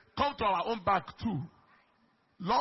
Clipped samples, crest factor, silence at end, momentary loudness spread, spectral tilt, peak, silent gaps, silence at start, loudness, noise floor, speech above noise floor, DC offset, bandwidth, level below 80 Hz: under 0.1%; 18 dB; 0 s; 11 LU; -3.5 dB/octave; -14 dBFS; none; 0.15 s; -32 LUFS; -70 dBFS; 38 dB; under 0.1%; 5.8 kHz; -58 dBFS